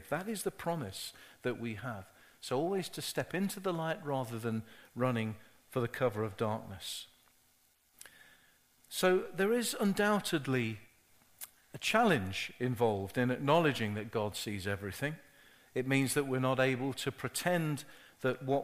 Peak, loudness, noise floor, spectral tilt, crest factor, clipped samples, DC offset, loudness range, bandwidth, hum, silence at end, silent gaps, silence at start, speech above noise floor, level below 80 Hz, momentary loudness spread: -14 dBFS; -34 LUFS; -70 dBFS; -5 dB/octave; 22 dB; under 0.1%; under 0.1%; 6 LU; 15.5 kHz; none; 0 s; none; 0 s; 36 dB; -68 dBFS; 14 LU